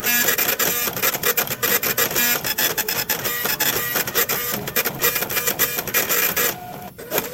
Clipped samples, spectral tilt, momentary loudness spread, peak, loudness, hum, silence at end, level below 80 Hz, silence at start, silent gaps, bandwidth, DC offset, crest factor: under 0.1%; -1 dB/octave; 5 LU; -2 dBFS; -19 LUFS; none; 0 s; -52 dBFS; 0 s; none; 17 kHz; under 0.1%; 20 dB